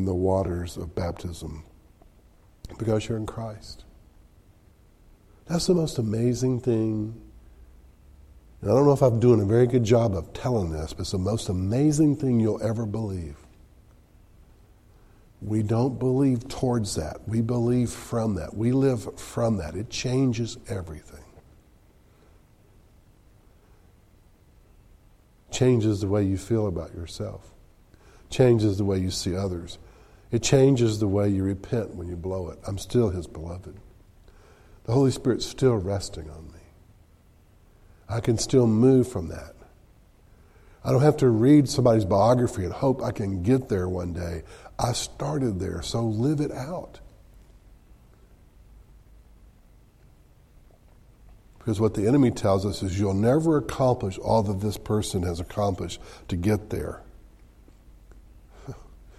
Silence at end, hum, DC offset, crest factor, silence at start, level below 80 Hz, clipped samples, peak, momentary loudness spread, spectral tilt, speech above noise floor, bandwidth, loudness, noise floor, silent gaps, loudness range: 0.1 s; none; under 0.1%; 20 dB; 0 s; -46 dBFS; under 0.1%; -6 dBFS; 17 LU; -7 dB/octave; 33 dB; 14 kHz; -25 LUFS; -57 dBFS; none; 10 LU